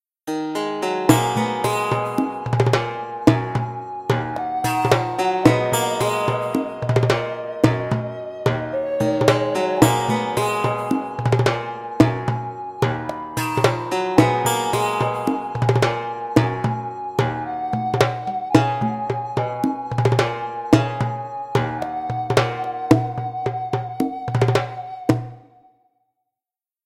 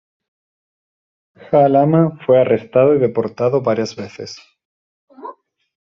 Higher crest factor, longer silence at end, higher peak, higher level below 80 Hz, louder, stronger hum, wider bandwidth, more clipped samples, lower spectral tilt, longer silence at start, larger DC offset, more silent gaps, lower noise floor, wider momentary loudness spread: about the same, 20 dB vs 16 dB; first, 1.45 s vs 0.55 s; about the same, 0 dBFS vs -2 dBFS; first, -50 dBFS vs -60 dBFS; second, -21 LUFS vs -15 LUFS; neither; first, 16 kHz vs 7.4 kHz; neither; about the same, -6 dB/octave vs -7 dB/octave; second, 0.25 s vs 1.5 s; neither; second, none vs 4.65-5.08 s; first, under -90 dBFS vs -37 dBFS; second, 9 LU vs 22 LU